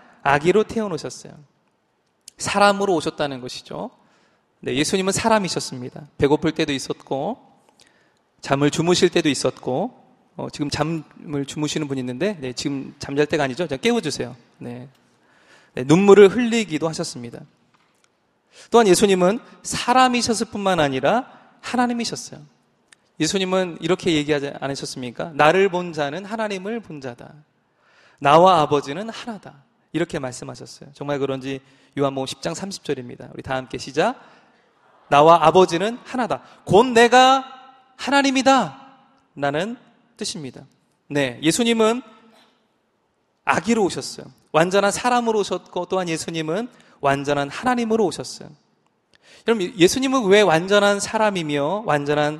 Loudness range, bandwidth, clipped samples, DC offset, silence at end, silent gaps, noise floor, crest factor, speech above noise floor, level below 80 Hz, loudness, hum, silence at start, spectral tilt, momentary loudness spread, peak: 8 LU; 13.5 kHz; under 0.1%; under 0.1%; 0 s; none; -67 dBFS; 20 dB; 48 dB; -56 dBFS; -20 LUFS; none; 0.25 s; -4.5 dB/octave; 18 LU; 0 dBFS